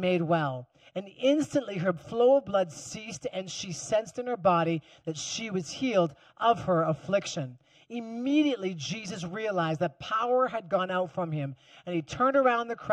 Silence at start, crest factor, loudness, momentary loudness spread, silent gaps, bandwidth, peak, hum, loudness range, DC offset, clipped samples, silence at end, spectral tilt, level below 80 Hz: 0 s; 18 dB; -29 LUFS; 13 LU; none; 11 kHz; -10 dBFS; none; 2 LU; under 0.1%; under 0.1%; 0 s; -5 dB/octave; -66 dBFS